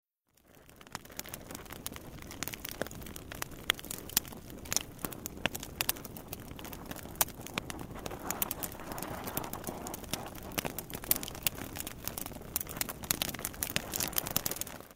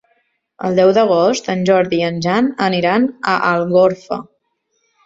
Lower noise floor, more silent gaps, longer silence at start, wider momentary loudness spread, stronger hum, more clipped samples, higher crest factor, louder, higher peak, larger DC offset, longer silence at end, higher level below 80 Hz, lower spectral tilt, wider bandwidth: about the same, -67 dBFS vs -67 dBFS; neither; second, 0.45 s vs 0.6 s; first, 12 LU vs 7 LU; neither; neither; first, 32 dB vs 14 dB; second, -36 LUFS vs -15 LUFS; second, -6 dBFS vs -2 dBFS; neither; second, 0 s vs 0.85 s; about the same, -54 dBFS vs -56 dBFS; second, -2 dB/octave vs -5.5 dB/octave; first, 16.5 kHz vs 7.8 kHz